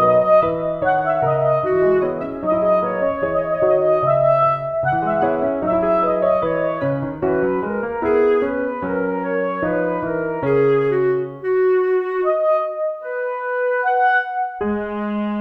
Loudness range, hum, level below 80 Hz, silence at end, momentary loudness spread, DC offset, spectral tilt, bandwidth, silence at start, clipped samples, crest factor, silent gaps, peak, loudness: 3 LU; none; -48 dBFS; 0 s; 7 LU; under 0.1%; -9.5 dB/octave; 4.9 kHz; 0 s; under 0.1%; 14 dB; none; -4 dBFS; -19 LUFS